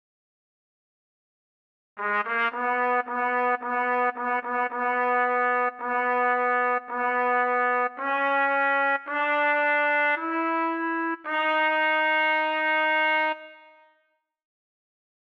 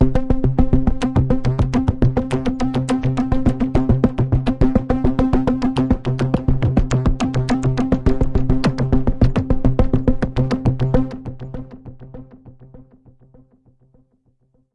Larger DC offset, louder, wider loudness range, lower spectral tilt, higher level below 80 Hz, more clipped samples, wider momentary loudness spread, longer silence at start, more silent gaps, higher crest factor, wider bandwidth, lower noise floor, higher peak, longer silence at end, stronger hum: neither; second, -24 LUFS vs -19 LUFS; second, 3 LU vs 6 LU; second, -4 dB/octave vs -8.5 dB/octave; second, -78 dBFS vs -24 dBFS; neither; about the same, 5 LU vs 4 LU; first, 1.95 s vs 0 s; neither; about the same, 12 dB vs 16 dB; second, 6.6 kHz vs 10.5 kHz; first, -72 dBFS vs -61 dBFS; second, -14 dBFS vs -2 dBFS; second, 1.75 s vs 1.9 s; neither